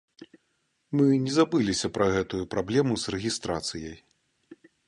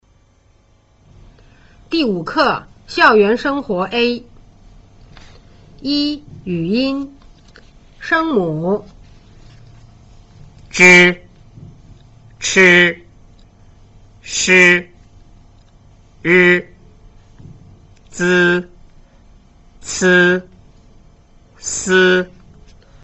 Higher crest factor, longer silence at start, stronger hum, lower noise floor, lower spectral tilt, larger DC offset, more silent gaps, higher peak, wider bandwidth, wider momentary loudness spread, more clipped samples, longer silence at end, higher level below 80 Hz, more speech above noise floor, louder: about the same, 20 dB vs 18 dB; second, 0.2 s vs 1.9 s; neither; first, -74 dBFS vs -53 dBFS; about the same, -5 dB/octave vs -4 dB/octave; neither; neither; second, -8 dBFS vs 0 dBFS; first, 11.5 kHz vs 8.2 kHz; second, 8 LU vs 17 LU; neither; second, 0.35 s vs 0.8 s; second, -54 dBFS vs -46 dBFS; first, 48 dB vs 40 dB; second, -26 LUFS vs -13 LUFS